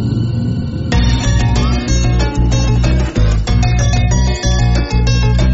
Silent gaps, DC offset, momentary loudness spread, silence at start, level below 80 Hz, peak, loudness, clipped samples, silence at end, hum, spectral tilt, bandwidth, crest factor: none; under 0.1%; 3 LU; 0 s; -16 dBFS; -2 dBFS; -14 LUFS; under 0.1%; 0 s; none; -6 dB/octave; 8 kHz; 10 dB